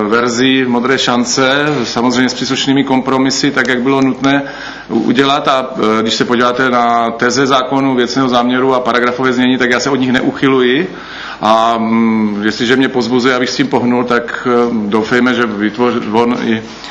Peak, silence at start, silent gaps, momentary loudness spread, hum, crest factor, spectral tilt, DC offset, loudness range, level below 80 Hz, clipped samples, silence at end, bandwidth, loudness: 0 dBFS; 0 s; none; 4 LU; none; 12 dB; -4.5 dB/octave; under 0.1%; 1 LU; -48 dBFS; under 0.1%; 0 s; 8.2 kHz; -12 LUFS